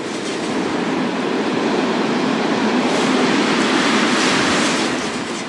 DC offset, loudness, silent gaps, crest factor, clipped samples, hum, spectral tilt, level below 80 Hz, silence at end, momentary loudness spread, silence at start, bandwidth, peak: under 0.1%; -17 LUFS; none; 14 dB; under 0.1%; none; -3.5 dB/octave; -58 dBFS; 0 s; 6 LU; 0 s; 11.5 kHz; -4 dBFS